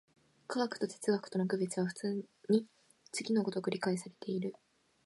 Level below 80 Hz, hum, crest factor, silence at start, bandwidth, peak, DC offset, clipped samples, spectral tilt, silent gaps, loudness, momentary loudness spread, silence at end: -84 dBFS; none; 20 dB; 0.5 s; 11.5 kHz; -18 dBFS; under 0.1%; under 0.1%; -5.5 dB/octave; none; -36 LUFS; 9 LU; 0.55 s